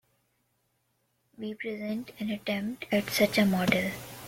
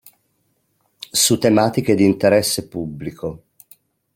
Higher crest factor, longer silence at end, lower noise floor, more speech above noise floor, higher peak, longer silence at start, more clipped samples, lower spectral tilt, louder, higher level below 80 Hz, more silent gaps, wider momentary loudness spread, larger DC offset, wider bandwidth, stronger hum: about the same, 22 dB vs 18 dB; second, 0 s vs 0.8 s; first, -75 dBFS vs -67 dBFS; second, 46 dB vs 50 dB; second, -8 dBFS vs -2 dBFS; first, 1.4 s vs 1.15 s; neither; about the same, -5 dB/octave vs -4 dB/octave; second, -29 LUFS vs -17 LUFS; second, -62 dBFS vs -54 dBFS; neither; second, 12 LU vs 15 LU; neither; about the same, 17 kHz vs 17 kHz; neither